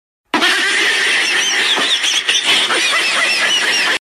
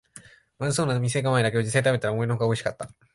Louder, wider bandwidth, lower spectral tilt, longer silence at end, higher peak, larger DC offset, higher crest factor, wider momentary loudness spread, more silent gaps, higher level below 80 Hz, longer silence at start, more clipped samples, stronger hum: first, -12 LUFS vs -25 LUFS; first, 16 kHz vs 11.5 kHz; second, 1 dB/octave vs -5.5 dB/octave; second, 0.05 s vs 0.25 s; first, -2 dBFS vs -8 dBFS; neither; about the same, 14 dB vs 16 dB; second, 1 LU vs 8 LU; neither; second, -64 dBFS vs -58 dBFS; first, 0.35 s vs 0.15 s; neither; neither